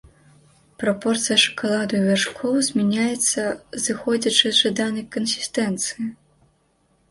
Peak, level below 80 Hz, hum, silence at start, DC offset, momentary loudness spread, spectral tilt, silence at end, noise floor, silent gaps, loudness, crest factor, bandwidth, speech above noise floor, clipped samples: -2 dBFS; -60 dBFS; none; 0.8 s; under 0.1%; 9 LU; -3 dB/octave; 0.95 s; -64 dBFS; none; -21 LUFS; 22 dB; 11.5 kHz; 42 dB; under 0.1%